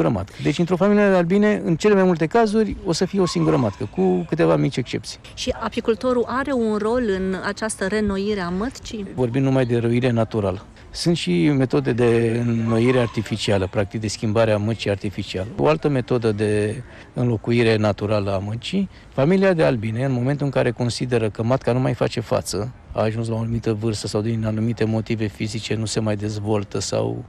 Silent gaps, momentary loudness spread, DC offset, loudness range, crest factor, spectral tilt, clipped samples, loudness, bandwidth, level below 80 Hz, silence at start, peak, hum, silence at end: none; 8 LU; under 0.1%; 4 LU; 12 dB; -6.5 dB/octave; under 0.1%; -21 LUFS; 13 kHz; -46 dBFS; 0 s; -8 dBFS; none; 0 s